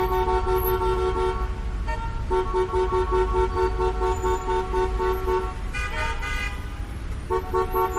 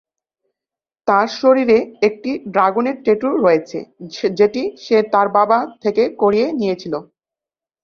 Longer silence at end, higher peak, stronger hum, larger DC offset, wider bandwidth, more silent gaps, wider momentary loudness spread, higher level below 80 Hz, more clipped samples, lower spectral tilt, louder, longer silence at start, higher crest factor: second, 0 s vs 0.8 s; second, -10 dBFS vs -2 dBFS; neither; neither; first, 15 kHz vs 6.8 kHz; neither; about the same, 8 LU vs 10 LU; first, -30 dBFS vs -60 dBFS; neither; about the same, -6.5 dB/octave vs -6 dB/octave; second, -25 LUFS vs -17 LUFS; second, 0 s vs 1.05 s; about the same, 14 dB vs 16 dB